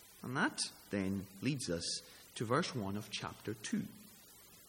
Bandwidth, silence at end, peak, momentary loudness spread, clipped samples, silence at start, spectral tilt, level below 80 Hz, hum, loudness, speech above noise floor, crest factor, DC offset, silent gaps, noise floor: 17 kHz; 0 s; -20 dBFS; 15 LU; under 0.1%; 0 s; -4 dB/octave; -72 dBFS; none; -39 LUFS; 21 dB; 22 dB; under 0.1%; none; -60 dBFS